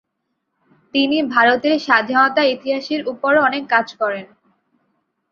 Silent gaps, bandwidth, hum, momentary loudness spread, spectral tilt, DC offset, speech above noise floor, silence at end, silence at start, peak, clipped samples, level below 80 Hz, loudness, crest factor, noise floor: none; 7 kHz; none; 9 LU; -4.5 dB/octave; under 0.1%; 57 dB; 1.05 s; 0.95 s; -2 dBFS; under 0.1%; -66 dBFS; -17 LUFS; 18 dB; -74 dBFS